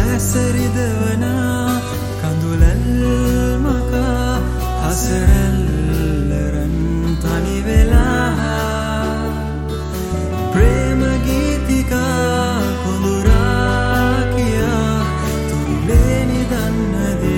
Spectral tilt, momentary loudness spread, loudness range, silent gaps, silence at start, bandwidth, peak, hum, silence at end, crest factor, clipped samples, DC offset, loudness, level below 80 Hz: -6 dB/octave; 6 LU; 2 LU; none; 0 s; 17 kHz; 0 dBFS; none; 0 s; 14 dB; under 0.1%; under 0.1%; -17 LUFS; -20 dBFS